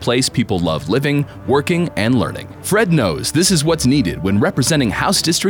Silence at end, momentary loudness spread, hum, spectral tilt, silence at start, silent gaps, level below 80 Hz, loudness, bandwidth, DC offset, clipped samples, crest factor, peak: 0 s; 5 LU; none; -4.5 dB/octave; 0 s; none; -40 dBFS; -16 LUFS; 20 kHz; under 0.1%; under 0.1%; 12 dB; -4 dBFS